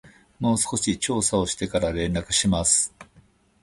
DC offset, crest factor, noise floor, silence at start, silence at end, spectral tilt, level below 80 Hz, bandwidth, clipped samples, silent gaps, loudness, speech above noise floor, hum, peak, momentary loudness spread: under 0.1%; 18 dB; -58 dBFS; 0.05 s; 0.6 s; -3.5 dB/octave; -42 dBFS; 11.5 kHz; under 0.1%; none; -23 LUFS; 34 dB; none; -6 dBFS; 6 LU